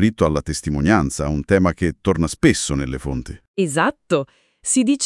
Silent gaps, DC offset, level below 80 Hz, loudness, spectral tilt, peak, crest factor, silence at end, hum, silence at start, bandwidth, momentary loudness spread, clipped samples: 3.48-3.54 s; under 0.1%; -36 dBFS; -20 LUFS; -5 dB/octave; 0 dBFS; 20 dB; 0 s; none; 0 s; 12 kHz; 10 LU; under 0.1%